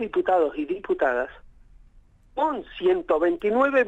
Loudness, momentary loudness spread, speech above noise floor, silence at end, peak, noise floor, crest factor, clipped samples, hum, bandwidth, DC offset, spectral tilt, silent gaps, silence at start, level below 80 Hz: -24 LUFS; 7 LU; 31 dB; 0 s; -10 dBFS; -54 dBFS; 16 dB; under 0.1%; none; 7.6 kHz; under 0.1%; -6.5 dB/octave; none; 0 s; -54 dBFS